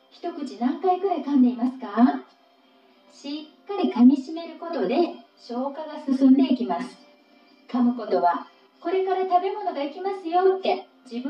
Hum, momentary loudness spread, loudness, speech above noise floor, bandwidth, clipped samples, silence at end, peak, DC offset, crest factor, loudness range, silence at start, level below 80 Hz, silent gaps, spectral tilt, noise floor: none; 17 LU; -23 LUFS; 35 dB; 7 kHz; under 0.1%; 0 s; -6 dBFS; under 0.1%; 18 dB; 3 LU; 0.25 s; -86 dBFS; none; -6.5 dB/octave; -58 dBFS